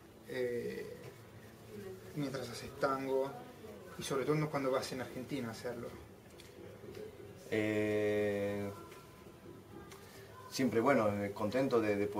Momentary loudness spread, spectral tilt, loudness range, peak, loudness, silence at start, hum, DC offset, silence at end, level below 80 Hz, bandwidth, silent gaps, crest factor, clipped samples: 21 LU; -5.5 dB/octave; 4 LU; -16 dBFS; -36 LUFS; 0 s; none; under 0.1%; 0 s; -68 dBFS; 16 kHz; none; 22 dB; under 0.1%